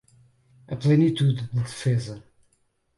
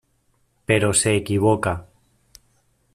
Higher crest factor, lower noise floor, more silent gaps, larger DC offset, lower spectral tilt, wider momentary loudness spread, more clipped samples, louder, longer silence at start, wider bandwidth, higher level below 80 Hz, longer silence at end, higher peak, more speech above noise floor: about the same, 16 dB vs 20 dB; first, -69 dBFS vs -65 dBFS; neither; neither; first, -7.5 dB/octave vs -4.5 dB/octave; first, 17 LU vs 12 LU; neither; second, -23 LUFS vs -20 LUFS; about the same, 0.7 s vs 0.7 s; second, 11.5 kHz vs 15 kHz; second, -60 dBFS vs -50 dBFS; second, 0.8 s vs 1.1 s; second, -10 dBFS vs -2 dBFS; about the same, 46 dB vs 46 dB